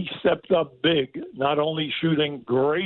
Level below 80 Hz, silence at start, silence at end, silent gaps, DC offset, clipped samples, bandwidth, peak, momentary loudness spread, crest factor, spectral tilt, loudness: -60 dBFS; 0 s; 0 s; none; under 0.1%; under 0.1%; 4.3 kHz; -8 dBFS; 3 LU; 16 dB; -9.5 dB/octave; -24 LUFS